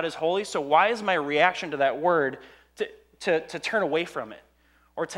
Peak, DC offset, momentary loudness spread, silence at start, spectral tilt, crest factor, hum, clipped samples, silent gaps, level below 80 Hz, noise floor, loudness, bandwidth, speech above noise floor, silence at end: -6 dBFS; under 0.1%; 13 LU; 0 s; -4 dB/octave; 20 dB; none; under 0.1%; none; -66 dBFS; -50 dBFS; -25 LUFS; 13 kHz; 25 dB; 0 s